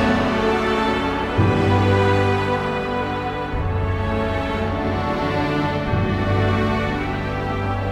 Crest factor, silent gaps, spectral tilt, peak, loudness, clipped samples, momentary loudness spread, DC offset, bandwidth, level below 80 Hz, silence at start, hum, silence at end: 16 dB; none; -7 dB/octave; -4 dBFS; -21 LUFS; under 0.1%; 7 LU; under 0.1%; 9.8 kHz; -34 dBFS; 0 s; none; 0 s